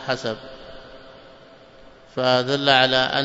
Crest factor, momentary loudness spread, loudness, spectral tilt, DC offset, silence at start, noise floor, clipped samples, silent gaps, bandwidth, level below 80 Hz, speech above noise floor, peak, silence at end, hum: 22 dB; 25 LU; -19 LUFS; -4.5 dB/octave; under 0.1%; 0 s; -47 dBFS; under 0.1%; none; 8 kHz; -54 dBFS; 27 dB; -2 dBFS; 0 s; none